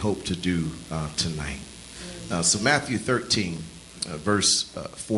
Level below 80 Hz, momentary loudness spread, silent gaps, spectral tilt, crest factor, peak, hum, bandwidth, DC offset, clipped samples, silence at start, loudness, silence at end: -48 dBFS; 17 LU; none; -3 dB/octave; 20 dB; -6 dBFS; none; 12 kHz; under 0.1%; under 0.1%; 0 s; -25 LUFS; 0 s